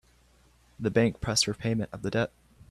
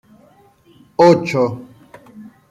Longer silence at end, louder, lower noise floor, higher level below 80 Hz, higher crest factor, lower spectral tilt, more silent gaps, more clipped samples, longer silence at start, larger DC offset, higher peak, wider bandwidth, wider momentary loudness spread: first, 0.45 s vs 0.25 s; second, -28 LUFS vs -15 LUFS; first, -62 dBFS vs -51 dBFS; first, -52 dBFS vs -60 dBFS; about the same, 20 dB vs 16 dB; second, -4.5 dB/octave vs -7 dB/octave; neither; neither; second, 0.8 s vs 1 s; neither; second, -10 dBFS vs -2 dBFS; first, 13.5 kHz vs 11 kHz; second, 7 LU vs 17 LU